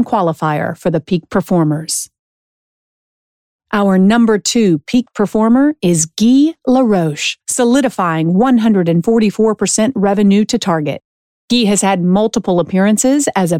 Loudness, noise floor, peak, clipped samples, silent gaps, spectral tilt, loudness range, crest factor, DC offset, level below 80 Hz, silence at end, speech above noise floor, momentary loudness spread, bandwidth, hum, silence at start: -13 LUFS; under -90 dBFS; -2 dBFS; under 0.1%; 2.19-3.59 s, 11.05-11.48 s; -5 dB/octave; 5 LU; 10 dB; under 0.1%; -50 dBFS; 0 s; over 78 dB; 6 LU; 16 kHz; none; 0 s